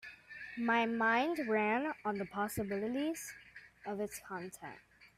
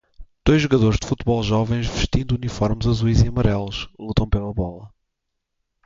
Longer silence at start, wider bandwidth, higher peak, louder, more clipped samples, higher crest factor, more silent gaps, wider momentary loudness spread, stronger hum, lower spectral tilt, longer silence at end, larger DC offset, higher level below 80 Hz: second, 0 s vs 0.2 s; first, 16 kHz vs 7.6 kHz; second, -18 dBFS vs -4 dBFS; second, -36 LUFS vs -21 LUFS; neither; about the same, 18 dB vs 18 dB; neither; first, 19 LU vs 8 LU; neither; second, -4.5 dB/octave vs -6.5 dB/octave; second, 0.1 s vs 1 s; neither; second, -72 dBFS vs -30 dBFS